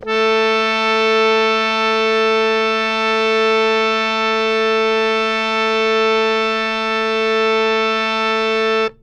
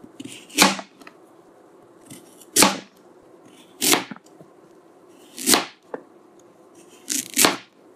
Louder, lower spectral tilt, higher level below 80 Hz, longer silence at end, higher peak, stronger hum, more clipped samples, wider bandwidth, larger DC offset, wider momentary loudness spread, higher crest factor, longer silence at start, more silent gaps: first, -15 LUFS vs -19 LUFS; first, -3 dB/octave vs -1 dB/octave; first, -52 dBFS vs -64 dBFS; second, 0.1 s vs 0.35 s; second, -4 dBFS vs 0 dBFS; neither; neither; second, 9 kHz vs 16 kHz; neither; second, 2 LU vs 22 LU; second, 14 dB vs 26 dB; second, 0 s vs 0.25 s; neither